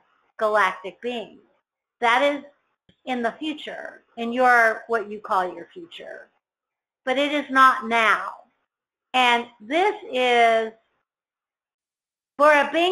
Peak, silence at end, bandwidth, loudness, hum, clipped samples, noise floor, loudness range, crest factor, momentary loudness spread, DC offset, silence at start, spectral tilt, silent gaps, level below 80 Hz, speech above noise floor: -4 dBFS; 0 s; 13.5 kHz; -21 LUFS; none; under 0.1%; under -90 dBFS; 4 LU; 20 dB; 20 LU; under 0.1%; 0.4 s; -2.5 dB/octave; 11.74-11.79 s; -70 dBFS; over 68 dB